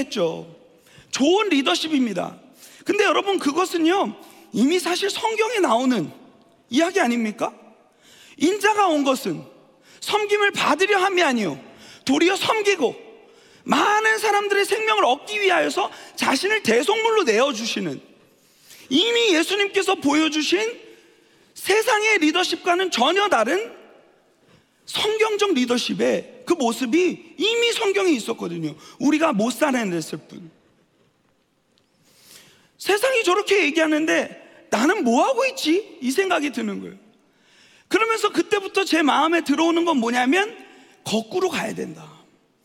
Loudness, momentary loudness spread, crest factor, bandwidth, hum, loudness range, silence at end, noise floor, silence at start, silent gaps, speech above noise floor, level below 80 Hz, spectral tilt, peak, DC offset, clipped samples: -20 LUFS; 11 LU; 18 dB; 17.5 kHz; none; 3 LU; 0.55 s; -65 dBFS; 0 s; none; 44 dB; -72 dBFS; -3 dB/octave; -4 dBFS; under 0.1%; under 0.1%